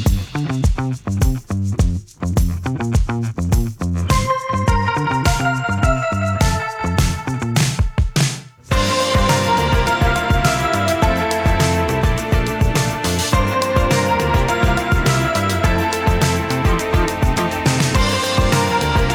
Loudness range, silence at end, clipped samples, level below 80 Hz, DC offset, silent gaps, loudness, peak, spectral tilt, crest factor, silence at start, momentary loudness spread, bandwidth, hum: 3 LU; 0 s; under 0.1%; -24 dBFS; under 0.1%; none; -18 LUFS; -2 dBFS; -5 dB/octave; 16 dB; 0 s; 5 LU; 20 kHz; none